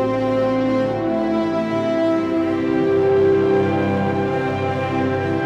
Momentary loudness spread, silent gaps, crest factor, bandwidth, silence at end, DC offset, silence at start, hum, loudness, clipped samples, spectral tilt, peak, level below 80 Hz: 5 LU; none; 12 dB; 8 kHz; 0 s; under 0.1%; 0 s; none; -19 LUFS; under 0.1%; -8 dB/octave; -8 dBFS; -50 dBFS